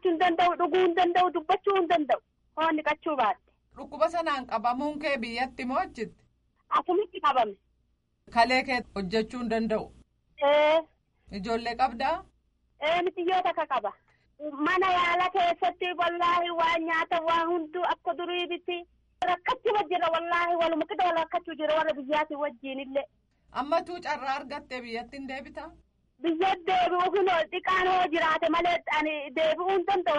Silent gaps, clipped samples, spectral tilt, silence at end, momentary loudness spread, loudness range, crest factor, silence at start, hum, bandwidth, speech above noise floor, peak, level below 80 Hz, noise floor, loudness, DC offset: none; under 0.1%; -4.5 dB/octave; 0 s; 12 LU; 5 LU; 18 dB; 0.05 s; none; 11 kHz; 45 dB; -10 dBFS; -60 dBFS; -72 dBFS; -27 LUFS; under 0.1%